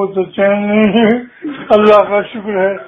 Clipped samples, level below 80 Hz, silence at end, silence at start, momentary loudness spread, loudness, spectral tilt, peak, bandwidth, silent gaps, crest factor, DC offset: 0.3%; -48 dBFS; 0 s; 0 s; 11 LU; -12 LUFS; -8 dB/octave; 0 dBFS; 5.8 kHz; none; 12 dB; under 0.1%